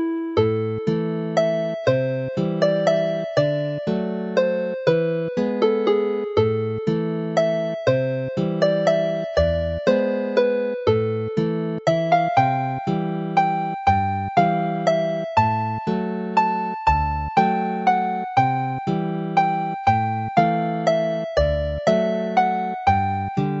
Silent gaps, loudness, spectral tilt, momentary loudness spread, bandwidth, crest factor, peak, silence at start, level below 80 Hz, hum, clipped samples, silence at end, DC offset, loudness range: none; -21 LUFS; -7.5 dB/octave; 5 LU; 7.8 kHz; 18 dB; -2 dBFS; 0 s; -40 dBFS; none; under 0.1%; 0 s; under 0.1%; 1 LU